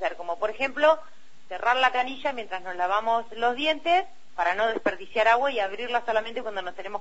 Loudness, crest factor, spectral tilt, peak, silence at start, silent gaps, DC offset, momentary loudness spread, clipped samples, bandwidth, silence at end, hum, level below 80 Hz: -26 LUFS; 20 dB; -3 dB/octave; -6 dBFS; 0 s; none; 1%; 11 LU; under 0.1%; 8 kHz; 0 s; none; -60 dBFS